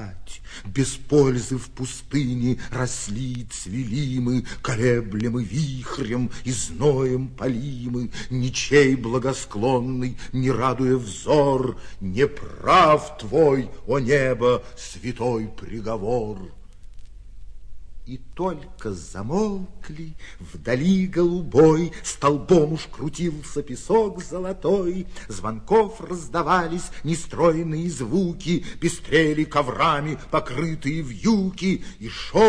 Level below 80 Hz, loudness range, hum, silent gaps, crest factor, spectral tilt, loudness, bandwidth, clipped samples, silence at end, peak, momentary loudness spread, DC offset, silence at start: -40 dBFS; 10 LU; none; none; 18 dB; -6 dB/octave; -23 LUFS; 11 kHz; under 0.1%; 0 s; -4 dBFS; 14 LU; under 0.1%; 0 s